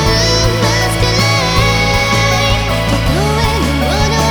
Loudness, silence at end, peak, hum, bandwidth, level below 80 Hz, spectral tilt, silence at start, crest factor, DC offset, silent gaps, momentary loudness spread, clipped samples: -12 LUFS; 0 s; 0 dBFS; none; 19.5 kHz; -20 dBFS; -4 dB/octave; 0 s; 12 dB; 0.6%; none; 3 LU; under 0.1%